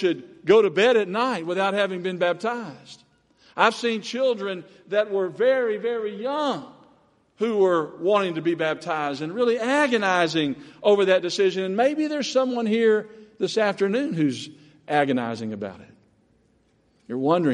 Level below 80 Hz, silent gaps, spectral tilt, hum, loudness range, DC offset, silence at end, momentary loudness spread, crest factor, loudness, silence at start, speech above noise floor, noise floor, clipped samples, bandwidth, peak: -72 dBFS; none; -5 dB/octave; none; 4 LU; under 0.1%; 0 s; 10 LU; 22 dB; -23 LUFS; 0 s; 41 dB; -63 dBFS; under 0.1%; 11.5 kHz; -2 dBFS